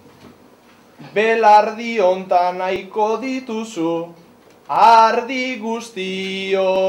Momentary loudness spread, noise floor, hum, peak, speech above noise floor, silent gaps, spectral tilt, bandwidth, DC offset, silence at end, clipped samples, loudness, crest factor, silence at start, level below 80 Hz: 14 LU; -49 dBFS; none; -4 dBFS; 32 dB; none; -4.5 dB/octave; 12.5 kHz; under 0.1%; 0 s; under 0.1%; -17 LUFS; 14 dB; 0.25 s; -64 dBFS